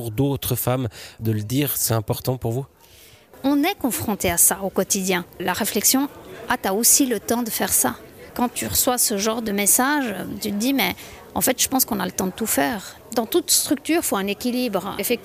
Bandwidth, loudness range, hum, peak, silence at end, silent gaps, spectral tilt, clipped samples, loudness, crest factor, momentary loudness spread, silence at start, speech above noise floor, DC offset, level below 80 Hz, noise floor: 15.5 kHz; 4 LU; none; -4 dBFS; 0 s; none; -3 dB/octave; under 0.1%; -21 LUFS; 18 dB; 11 LU; 0 s; 27 dB; under 0.1%; -50 dBFS; -49 dBFS